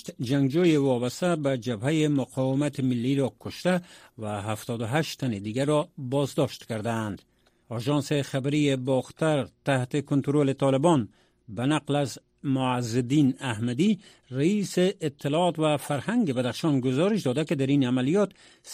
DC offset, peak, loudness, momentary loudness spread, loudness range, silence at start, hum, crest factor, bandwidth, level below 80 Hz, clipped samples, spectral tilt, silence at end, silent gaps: under 0.1%; -8 dBFS; -26 LUFS; 8 LU; 3 LU; 0.05 s; none; 18 dB; 15 kHz; -64 dBFS; under 0.1%; -6.5 dB/octave; 0 s; none